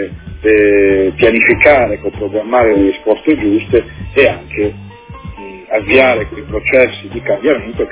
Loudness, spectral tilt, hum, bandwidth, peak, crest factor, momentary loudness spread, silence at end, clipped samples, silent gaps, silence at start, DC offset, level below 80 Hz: -12 LUFS; -9.5 dB/octave; none; 4 kHz; 0 dBFS; 12 dB; 12 LU; 0 s; 0.4%; none; 0 s; under 0.1%; -34 dBFS